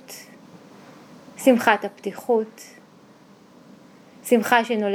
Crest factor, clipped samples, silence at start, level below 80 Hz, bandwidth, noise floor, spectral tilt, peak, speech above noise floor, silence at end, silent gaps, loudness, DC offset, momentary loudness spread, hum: 24 dB; under 0.1%; 0.1 s; -80 dBFS; over 20 kHz; -51 dBFS; -4 dB/octave; 0 dBFS; 30 dB; 0 s; none; -21 LUFS; under 0.1%; 24 LU; none